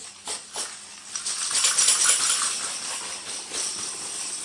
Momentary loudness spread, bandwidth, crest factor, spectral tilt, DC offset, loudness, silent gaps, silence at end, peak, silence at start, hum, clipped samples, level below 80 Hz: 15 LU; 11.5 kHz; 22 dB; 2.5 dB/octave; under 0.1%; -23 LUFS; none; 0 s; -4 dBFS; 0 s; none; under 0.1%; -72 dBFS